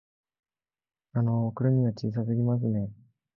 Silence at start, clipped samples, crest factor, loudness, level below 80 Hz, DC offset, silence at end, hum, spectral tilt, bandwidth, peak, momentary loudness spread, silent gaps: 1.15 s; under 0.1%; 16 dB; -28 LUFS; -60 dBFS; under 0.1%; 0.45 s; none; -10.5 dB/octave; 6 kHz; -14 dBFS; 7 LU; none